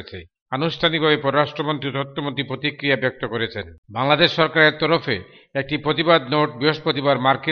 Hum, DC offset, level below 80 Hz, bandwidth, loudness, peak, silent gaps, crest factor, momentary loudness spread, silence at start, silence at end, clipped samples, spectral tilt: none; under 0.1%; -56 dBFS; 6.6 kHz; -20 LUFS; 0 dBFS; 0.42-0.46 s, 3.78-3.83 s; 20 dB; 12 LU; 0 s; 0 s; under 0.1%; -7 dB/octave